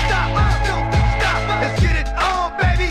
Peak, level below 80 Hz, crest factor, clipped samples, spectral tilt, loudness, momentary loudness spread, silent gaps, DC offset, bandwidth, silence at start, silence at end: -4 dBFS; -22 dBFS; 12 dB; under 0.1%; -5.5 dB/octave; -18 LUFS; 2 LU; none; under 0.1%; 12 kHz; 0 s; 0 s